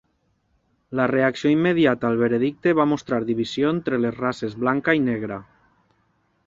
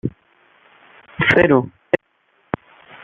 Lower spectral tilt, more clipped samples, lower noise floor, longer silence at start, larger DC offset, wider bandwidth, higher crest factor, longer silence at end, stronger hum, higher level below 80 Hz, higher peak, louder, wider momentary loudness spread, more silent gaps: about the same, -7 dB/octave vs -7.5 dB/octave; neither; first, -68 dBFS vs -62 dBFS; first, 0.9 s vs 0.05 s; neither; about the same, 7.6 kHz vs 7.6 kHz; about the same, 18 dB vs 20 dB; about the same, 1.05 s vs 1.05 s; neither; second, -60 dBFS vs -50 dBFS; about the same, -4 dBFS vs -2 dBFS; second, -22 LUFS vs -18 LUFS; second, 7 LU vs 17 LU; neither